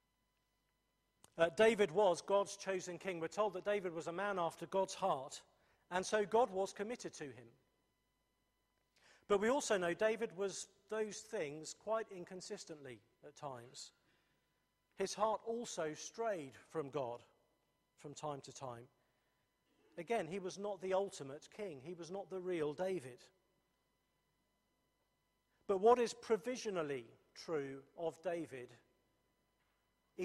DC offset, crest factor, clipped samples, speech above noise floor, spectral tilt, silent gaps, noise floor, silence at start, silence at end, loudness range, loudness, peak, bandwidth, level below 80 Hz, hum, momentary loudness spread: under 0.1%; 24 dB; under 0.1%; 43 dB; -4 dB/octave; none; -83 dBFS; 1.35 s; 0 s; 10 LU; -40 LUFS; -18 dBFS; 13.5 kHz; -80 dBFS; none; 18 LU